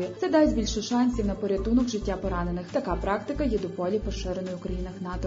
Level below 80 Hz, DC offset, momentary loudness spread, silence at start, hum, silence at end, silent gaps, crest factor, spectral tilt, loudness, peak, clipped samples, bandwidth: -38 dBFS; under 0.1%; 10 LU; 0 s; none; 0 s; none; 16 dB; -6 dB/octave; -27 LUFS; -10 dBFS; under 0.1%; 7.8 kHz